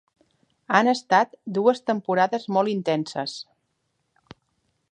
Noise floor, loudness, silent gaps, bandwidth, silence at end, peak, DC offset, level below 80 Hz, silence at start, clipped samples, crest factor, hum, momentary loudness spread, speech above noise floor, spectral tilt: -74 dBFS; -23 LUFS; none; 10 kHz; 1.5 s; -2 dBFS; under 0.1%; -74 dBFS; 0.7 s; under 0.1%; 22 dB; none; 10 LU; 52 dB; -5 dB/octave